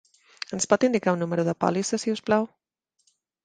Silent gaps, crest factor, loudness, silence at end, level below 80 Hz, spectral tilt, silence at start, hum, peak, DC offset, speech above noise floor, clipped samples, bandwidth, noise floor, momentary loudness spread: none; 22 dB; -25 LUFS; 1 s; -68 dBFS; -5 dB/octave; 0.5 s; none; -4 dBFS; under 0.1%; 46 dB; under 0.1%; 10 kHz; -70 dBFS; 11 LU